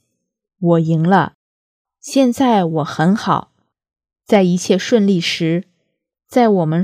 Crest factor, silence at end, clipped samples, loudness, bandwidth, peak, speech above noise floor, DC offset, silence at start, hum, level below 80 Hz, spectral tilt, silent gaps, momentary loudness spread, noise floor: 16 dB; 0 s; under 0.1%; -16 LUFS; 15 kHz; 0 dBFS; 58 dB; under 0.1%; 0.6 s; none; -62 dBFS; -6 dB/octave; 1.34-1.85 s; 6 LU; -72 dBFS